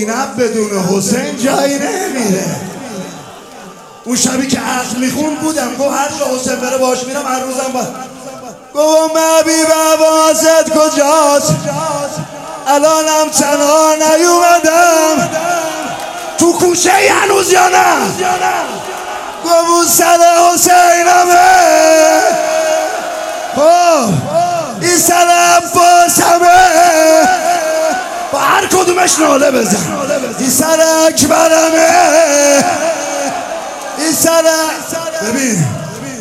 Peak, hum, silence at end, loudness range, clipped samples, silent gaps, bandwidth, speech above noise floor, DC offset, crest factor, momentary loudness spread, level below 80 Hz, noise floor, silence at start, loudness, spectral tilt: 0 dBFS; none; 0 s; 8 LU; 0.2%; none; 16.5 kHz; 23 dB; under 0.1%; 10 dB; 13 LU; -50 dBFS; -33 dBFS; 0 s; -10 LUFS; -3 dB/octave